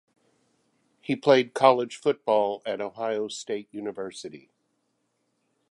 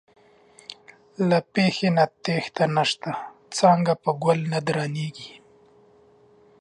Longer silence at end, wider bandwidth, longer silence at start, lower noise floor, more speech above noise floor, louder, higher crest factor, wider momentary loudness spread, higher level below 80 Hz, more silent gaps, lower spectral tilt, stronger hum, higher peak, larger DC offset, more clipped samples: about the same, 1.35 s vs 1.3 s; about the same, 11.5 kHz vs 10.5 kHz; first, 1.1 s vs 0.7 s; first, -75 dBFS vs -56 dBFS; first, 49 dB vs 33 dB; about the same, -25 LUFS vs -23 LUFS; about the same, 24 dB vs 20 dB; second, 16 LU vs 21 LU; second, -76 dBFS vs -70 dBFS; neither; about the same, -4.5 dB/octave vs -5.5 dB/octave; neither; about the same, -4 dBFS vs -4 dBFS; neither; neither